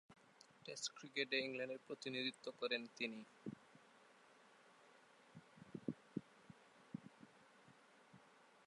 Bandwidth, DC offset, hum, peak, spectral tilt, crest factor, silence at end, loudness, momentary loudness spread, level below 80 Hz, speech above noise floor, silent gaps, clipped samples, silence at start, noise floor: 11 kHz; under 0.1%; none; -26 dBFS; -3 dB/octave; 24 dB; 0.05 s; -47 LUFS; 24 LU; under -90 dBFS; 22 dB; none; under 0.1%; 0.1 s; -69 dBFS